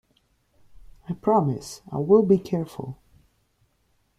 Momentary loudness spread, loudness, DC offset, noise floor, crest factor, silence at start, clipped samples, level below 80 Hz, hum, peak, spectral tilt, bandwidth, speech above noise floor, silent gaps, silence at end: 19 LU; -23 LUFS; under 0.1%; -68 dBFS; 20 dB; 1.1 s; under 0.1%; -58 dBFS; none; -6 dBFS; -8 dB/octave; 14 kHz; 45 dB; none; 1.25 s